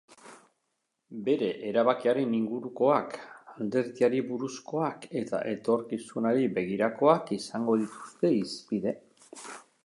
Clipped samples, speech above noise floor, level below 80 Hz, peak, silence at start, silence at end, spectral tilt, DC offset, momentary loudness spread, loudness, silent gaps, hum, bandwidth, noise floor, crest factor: under 0.1%; 52 dB; -74 dBFS; -8 dBFS; 0.1 s; 0.25 s; -6 dB/octave; under 0.1%; 14 LU; -29 LUFS; none; none; 11.5 kHz; -80 dBFS; 20 dB